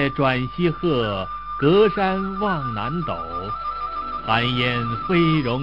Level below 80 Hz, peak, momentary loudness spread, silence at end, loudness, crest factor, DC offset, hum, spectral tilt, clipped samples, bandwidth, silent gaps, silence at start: -44 dBFS; -2 dBFS; 10 LU; 0 s; -22 LUFS; 18 dB; 0.7%; none; -8.5 dB/octave; under 0.1%; 7.2 kHz; none; 0 s